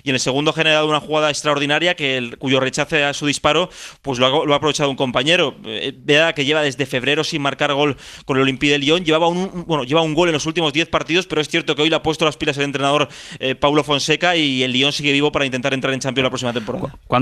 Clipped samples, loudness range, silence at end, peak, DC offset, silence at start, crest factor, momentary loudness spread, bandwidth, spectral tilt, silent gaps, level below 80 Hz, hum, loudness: under 0.1%; 1 LU; 0 s; -2 dBFS; under 0.1%; 0.05 s; 16 dB; 7 LU; 14 kHz; -4 dB/octave; none; -50 dBFS; none; -17 LUFS